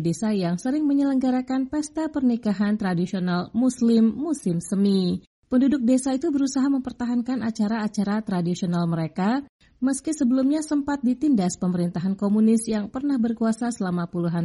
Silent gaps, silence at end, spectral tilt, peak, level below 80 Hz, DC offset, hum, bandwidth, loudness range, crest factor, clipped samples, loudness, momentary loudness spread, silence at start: 5.27-5.43 s, 9.49-9.59 s; 0 s; -6.5 dB/octave; -10 dBFS; -58 dBFS; under 0.1%; none; 11.5 kHz; 2 LU; 12 dB; under 0.1%; -23 LUFS; 6 LU; 0 s